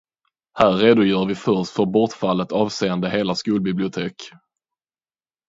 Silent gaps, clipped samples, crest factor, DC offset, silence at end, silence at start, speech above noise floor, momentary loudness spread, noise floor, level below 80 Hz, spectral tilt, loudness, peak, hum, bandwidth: none; under 0.1%; 20 dB; under 0.1%; 1.2 s; 0.55 s; over 71 dB; 13 LU; under -90 dBFS; -56 dBFS; -6 dB/octave; -20 LUFS; 0 dBFS; none; 7.8 kHz